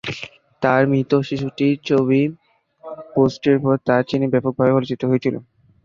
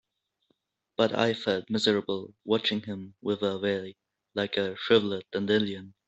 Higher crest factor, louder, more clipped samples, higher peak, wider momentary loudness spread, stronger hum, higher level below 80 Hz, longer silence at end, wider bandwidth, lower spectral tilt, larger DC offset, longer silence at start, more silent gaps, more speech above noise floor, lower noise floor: about the same, 18 dB vs 22 dB; first, -19 LUFS vs -28 LUFS; neither; first, -2 dBFS vs -8 dBFS; about the same, 12 LU vs 11 LU; neither; first, -56 dBFS vs -70 dBFS; first, 0.4 s vs 0.2 s; second, 7.2 kHz vs 8.2 kHz; first, -8 dB/octave vs -5.5 dB/octave; neither; second, 0.05 s vs 1 s; neither; second, 24 dB vs 47 dB; second, -42 dBFS vs -75 dBFS